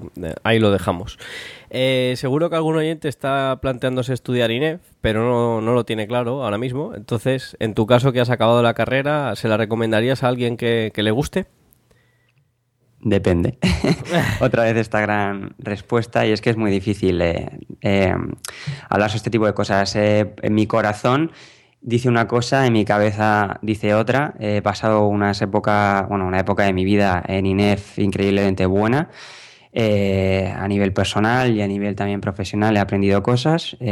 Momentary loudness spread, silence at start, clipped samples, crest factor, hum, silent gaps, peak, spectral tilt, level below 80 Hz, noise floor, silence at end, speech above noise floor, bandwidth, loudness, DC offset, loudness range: 8 LU; 0 s; under 0.1%; 18 dB; none; none; -2 dBFS; -6.5 dB/octave; -44 dBFS; -64 dBFS; 0 s; 45 dB; 15.5 kHz; -19 LUFS; under 0.1%; 3 LU